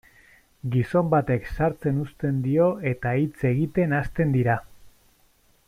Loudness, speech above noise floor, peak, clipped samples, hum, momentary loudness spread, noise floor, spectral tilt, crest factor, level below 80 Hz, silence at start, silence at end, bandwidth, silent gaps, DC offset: -24 LUFS; 38 dB; -8 dBFS; under 0.1%; none; 6 LU; -61 dBFS; -9.5 dB/octave; 16 dB; -46 dBFS; 0.65 s; 0.8 s; 14 kHz; none; under 0.1%